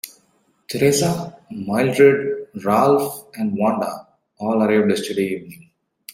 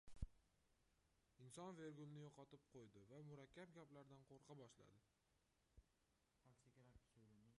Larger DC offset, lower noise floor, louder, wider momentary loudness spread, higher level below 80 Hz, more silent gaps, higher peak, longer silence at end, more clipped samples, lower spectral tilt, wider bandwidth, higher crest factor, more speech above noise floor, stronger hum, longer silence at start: neither; second, -62 dBFS vs -86 dBFS; first, -19 LUFS vs -63 LUFS; first, 16 LU vs 9 LU; first, -60 dBFS vs -70 dBFS; neither; first, -2 dBFS vs -34 dBFS; first, 0.6 s vs 0 s; neither; about the same, -5.5 dB/octave vs -6 dB/octave; first, 16.5 kHz vs 11 kHz; second, 18 dB vs 28 dB; first, 44 dB vs 23 dB; neither; about the same, 0.05 s vs 0.05 s